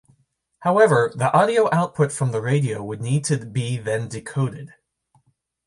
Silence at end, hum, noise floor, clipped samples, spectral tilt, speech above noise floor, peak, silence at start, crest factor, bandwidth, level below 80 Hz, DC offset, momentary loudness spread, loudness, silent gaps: 1 s; none; -65 dBFS; under 0.1%; -6 dB/octave; 44 dB; -2 dBFS; 0.6 s; 18 dB; 11.5 kHz; -60 dBFS; under 0.1%; 10 LU; -21 LUFS; none